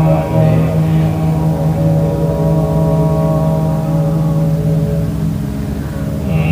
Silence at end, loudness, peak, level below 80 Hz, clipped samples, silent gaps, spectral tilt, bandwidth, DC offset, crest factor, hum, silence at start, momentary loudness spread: 0 s; -14 LUFS; 0 dBFS; -28 dBFS; under 0.1%; none; -9 dB/octave; 16 kHz; under 0.1%; 14 dB; none; 0 s; 7 LU